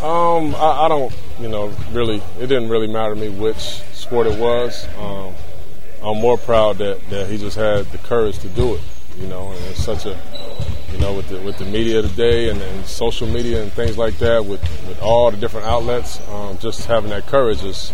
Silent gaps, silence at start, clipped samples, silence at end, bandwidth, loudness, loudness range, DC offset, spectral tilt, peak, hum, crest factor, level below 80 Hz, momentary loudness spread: none; 0 s; under 0.1%; 0 s; 16.5 kHz; -20 LUFS; 4 LU; 20%; -6 dB/octave; 0 dBFS; none; 18 dB; -32 dBFS; 13 LU